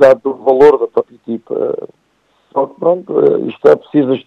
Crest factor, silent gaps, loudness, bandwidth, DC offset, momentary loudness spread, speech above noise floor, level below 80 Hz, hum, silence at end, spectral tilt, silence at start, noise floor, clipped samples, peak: 12 dB; none; -13 LUFS; 6.4 kHz; under 0.1%; 13 LU; 46 dB; -56 dBFS; none; 0.05 s; -7.5 dB/octave; 0 s; -58 dBFS; 0.4%; 0 dBFS